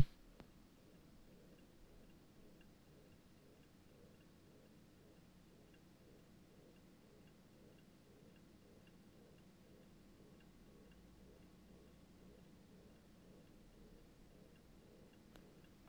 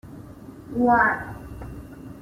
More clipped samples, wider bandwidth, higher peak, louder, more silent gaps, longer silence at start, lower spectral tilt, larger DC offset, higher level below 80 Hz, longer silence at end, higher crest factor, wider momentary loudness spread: neither; first, over 20 kHz vs 15.5 kHz; second, -16 dBFS vs -6 dBFS; second, -62 LUFS vs -21 LUFS; neither; about the same, 0 s vs 0.05 s; second, -6 dB/octave vs -8 dB/octave; neither; second, -70 dBFS vs -46 dBFS; about the same, 0 s vs 0 s; first, 34 dB vs 20 dB; second, 2 LU vs 24 LU